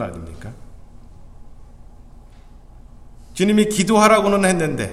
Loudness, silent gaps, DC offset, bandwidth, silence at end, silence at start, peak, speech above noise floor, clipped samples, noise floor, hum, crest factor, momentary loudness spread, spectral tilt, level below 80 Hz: -16 LUFS; none; under 0.1%; 14.5 kHz; 0 s; 0 s; 0 dBFS; 25 dB; under 0.1%; -42 dBFS; none; 20 dB; 23 LU; -5 dB/octave; -42 dBFS